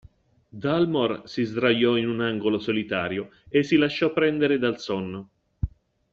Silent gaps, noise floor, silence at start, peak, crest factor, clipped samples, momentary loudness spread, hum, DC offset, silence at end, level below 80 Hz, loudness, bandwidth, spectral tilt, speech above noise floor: none; -55 dBFS; 0.55 s; -8 dBFS; 18 dB; under 0.1%; 13 LU; none; under 0.1%; 0.45 s; -48 dBFS; -24 LUFS; 7.4 kHz; -6.5 dB/octave; 31 dB